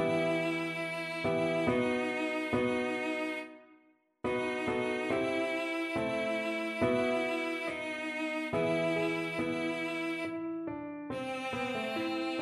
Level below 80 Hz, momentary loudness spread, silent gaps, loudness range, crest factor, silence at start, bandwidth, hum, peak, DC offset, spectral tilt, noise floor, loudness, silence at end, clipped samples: -66 dBFS; 7 LU; none; 2 LU; 16 dB; 0 s; 13.5 kHz; none; -18 dBFS; under 0.1%; -5.5 dB/octave; -66 dBFS; -33 LUFS; 0 s; under 0.1%